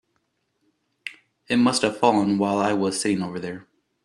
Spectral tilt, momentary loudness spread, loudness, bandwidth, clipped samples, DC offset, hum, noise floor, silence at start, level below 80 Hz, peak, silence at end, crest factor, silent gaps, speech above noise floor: -4.5 dB/octave; 18 LU; -22 LUFS; 12.5 kHz; under 0.1%; under 0.1%; none; -73 dBFS; 1.05 s; -64 dBFS; -4 dBFS; 0.45 s; 20 dB; none; 51 dB